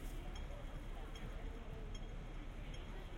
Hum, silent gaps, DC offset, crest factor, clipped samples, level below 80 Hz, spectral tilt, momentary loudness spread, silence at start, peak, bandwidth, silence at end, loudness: none; none; under 0.1%; 12 dB; under 0.1%; -48 dBFS; -5.5 dB/octave; 1 LU; 0 s; -34 dBFS; 16 kHz; 0 s; -51 LUFS